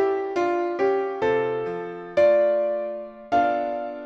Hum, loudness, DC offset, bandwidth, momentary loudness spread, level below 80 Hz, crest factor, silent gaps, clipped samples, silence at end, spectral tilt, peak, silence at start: none; -23 LUFS; under 0.1%; 7.2 kHz; 11 LU; -62 dBFS; 14 dB; none; under 0.1%; 0 s; -6.5 dB/octave; -10 dBFS; 0 s